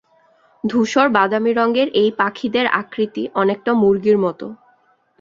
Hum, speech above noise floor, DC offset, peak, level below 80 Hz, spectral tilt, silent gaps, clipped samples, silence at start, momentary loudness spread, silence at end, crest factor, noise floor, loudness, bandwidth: none; 41 dB; under 0.1%; 0 dBFS; -60 dBFS; -5.5 dB/octave; none; under 0.1%; 0.65 s; 8 LU; 0.65 s; 18 dB; -58 dBFS; -17 LUFS; 7.6 kHz